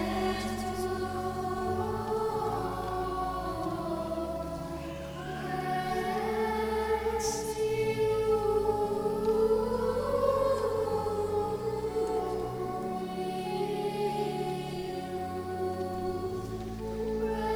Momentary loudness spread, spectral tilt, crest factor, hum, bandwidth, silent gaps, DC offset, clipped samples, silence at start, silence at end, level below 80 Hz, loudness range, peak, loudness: 8 LU; -5.5 dB/octave; 16 dB; none; over 20 kHz; none; under 0.1%; under 0.1%; 0 s; 0 s; -48 dBFS; 6 LU; -14 dBFS; -32 LUFS